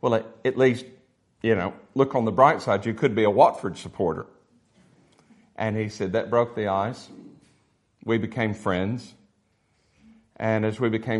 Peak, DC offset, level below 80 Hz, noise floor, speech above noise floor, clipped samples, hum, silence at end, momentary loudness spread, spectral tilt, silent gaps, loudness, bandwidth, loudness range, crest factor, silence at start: -2 dBFS; under 0.1%; -64 dBFS; -68 dBFS; 45 dB; under 0.1%; none; 0 s; 14 LU; -7 dB/octave; none; -24 LUFS; 11.5 kHz; 7 LU; 22 dB; 0.05 s